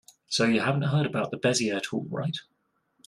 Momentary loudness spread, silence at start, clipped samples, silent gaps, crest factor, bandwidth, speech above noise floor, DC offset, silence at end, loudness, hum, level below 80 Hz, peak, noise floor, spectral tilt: 8 LU; 0.3 s; under 0.1%; none; 18 dB; 12.5 kHz; 46 dB; under 0.1%; 0.65 s; -27 LUFS; none; -68 dBFS; -10 dBFS; -73 dBFS; -5 dB/octave